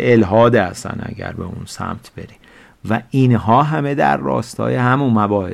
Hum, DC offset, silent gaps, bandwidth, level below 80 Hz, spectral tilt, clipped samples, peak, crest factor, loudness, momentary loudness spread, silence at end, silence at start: none; under 0.1%; none; 13 kHz; -46 dBFS; -7.5 dB/octave; under 0.1%; -4 dBFS; 14 dB; -16 LUFS; 16 LU; 0 s; 0 s